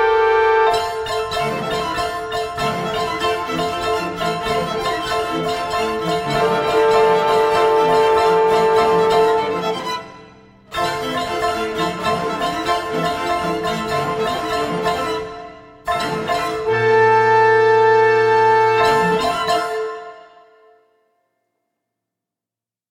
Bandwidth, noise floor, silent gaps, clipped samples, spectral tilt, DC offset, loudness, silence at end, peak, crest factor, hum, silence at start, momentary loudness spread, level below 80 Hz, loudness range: 15.5 kHz; -89 dBFS; none; under 0.1%; -4.5 dB/octave; under 0.1%; -17 LUFS; 2.7 s; -2 dBFS; 16 dB; none; 0 s; 10 LU; -46 dBFS; 7 LU